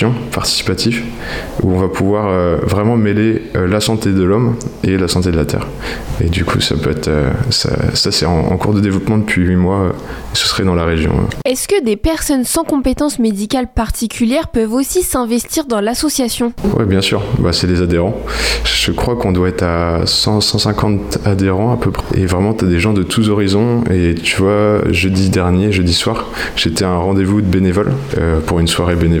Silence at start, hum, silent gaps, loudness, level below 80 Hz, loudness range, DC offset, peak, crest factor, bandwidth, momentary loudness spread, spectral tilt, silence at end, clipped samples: 0 s; none; none; -14 LUFS; -30 dBFS; 2 LU; under 0.1%; -4 dBFS; 10 dB; 18 kHz; 4 LU; -5 dB/octave; 0 s; under 0.1%